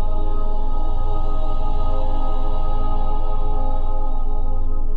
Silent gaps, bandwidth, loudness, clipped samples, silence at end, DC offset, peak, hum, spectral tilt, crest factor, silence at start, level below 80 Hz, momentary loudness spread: none; 3.8 kHz; -27 LUFS; under 0.1%; 0 s; under 0.1%; -8 dBFS; none; -9 dB/octave; 6 dB; 0 s; -16 dBFS; 2 LU